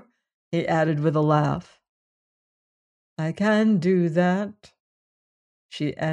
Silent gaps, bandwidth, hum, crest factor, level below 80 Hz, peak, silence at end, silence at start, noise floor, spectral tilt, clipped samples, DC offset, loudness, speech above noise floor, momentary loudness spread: 1.89-3.16 s, 4.80-5.69 s; 10 kHz; none; 18 dB; -62 dBFS; -6 dBFS; 0 s; 0.5 s; under -90 dBFS; -7.5 dB/octave; under 0.1%; under 0.1%; -23 LUFS; over 68 dB; 12 LU